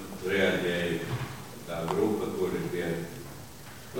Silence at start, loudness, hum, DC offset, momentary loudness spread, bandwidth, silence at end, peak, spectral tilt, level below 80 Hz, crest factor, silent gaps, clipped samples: 0 s; -30 LUFS; none; 0.3%; 17 LU; 17 kHz; 0 s; -14 dBFS; -5.5 dB/octave; -56 dBFS; 18 dB; none; under 0.1%